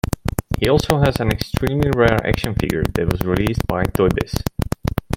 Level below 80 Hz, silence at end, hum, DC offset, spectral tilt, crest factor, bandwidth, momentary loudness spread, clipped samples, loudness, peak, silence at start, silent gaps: -30 dBFS; 0 s; none; under 0.1%; -6.5 dB/octave; 18 dB; 17 kHz; 8 LU; under 0.1%; -19 LUFS; 0 dBFS; 0.05 s; none